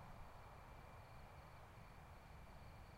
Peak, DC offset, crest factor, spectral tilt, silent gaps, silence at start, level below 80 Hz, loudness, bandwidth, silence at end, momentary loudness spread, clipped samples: -46 dBFS; under 0.1%; 14 dB; -5.5 dB/octave; none; 0 s; -64 dBFS; -61 LUFS; 16 kHz; 0 s; 1 LU; under 0.1%